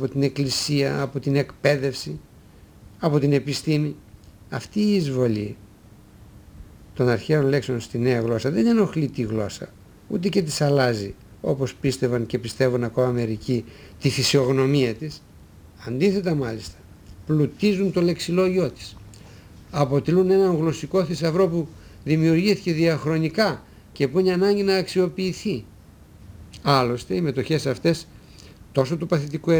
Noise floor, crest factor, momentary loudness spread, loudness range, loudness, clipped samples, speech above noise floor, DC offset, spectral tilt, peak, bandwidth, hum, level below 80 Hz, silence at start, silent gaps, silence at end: -48 dBFS; 20 dB; 14 LU; 4 LU; -22 LUFS; under 0.1%; 27 dB; under 0.1%; -6 dB/octave; -4 dBFS; over 20 kHz; none; -50 dBFS; 0 s; none; 0 s